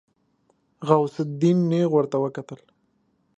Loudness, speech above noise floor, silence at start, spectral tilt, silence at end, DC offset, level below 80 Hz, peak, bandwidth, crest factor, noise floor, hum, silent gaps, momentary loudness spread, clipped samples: -22 LUFS; 46 dB; 0.8 s; -8.5 dB/octave; 0.85 s; under 0.1%; -70 dBFS; -2 dBFS; 8.2 kHz; 22 dB; -68 dBFS; none; none; 17 LU; under 0.1%